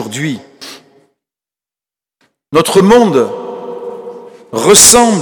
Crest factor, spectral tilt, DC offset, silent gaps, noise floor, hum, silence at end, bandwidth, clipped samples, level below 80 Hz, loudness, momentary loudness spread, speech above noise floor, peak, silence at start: 12 dB; -3 dB/octave; under 0.1%; none; -89 dBFS; none; 0 s; over 20 kHz; 0.8%; -44 dBFS; -8 LUFS; 26 LU; 81 dB; 0 dBFS; 0 s